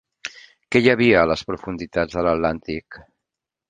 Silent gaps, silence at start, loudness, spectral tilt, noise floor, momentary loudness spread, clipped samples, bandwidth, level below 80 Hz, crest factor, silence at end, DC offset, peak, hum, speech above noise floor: none; 0.25 s; -20 LUFS; -6 dB/octave; -85 dBFS; 18 LU; under 0.1%; 9.4 kHz; -46 dBFS; 20 dB; 0.7 s; under 0.1%; -2 dBFS; none; 65 dB